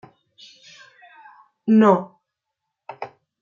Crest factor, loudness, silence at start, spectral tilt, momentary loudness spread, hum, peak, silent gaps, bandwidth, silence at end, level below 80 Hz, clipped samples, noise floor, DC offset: 20 dB; -18 LUFS; 1.65 s; -8 dB/octave; 25 LU; none; -2 dBFS; none; 7.2 kHz; 0.35 s; -74 dBFS; under 0.1%; -81 dBFS; under 0.1%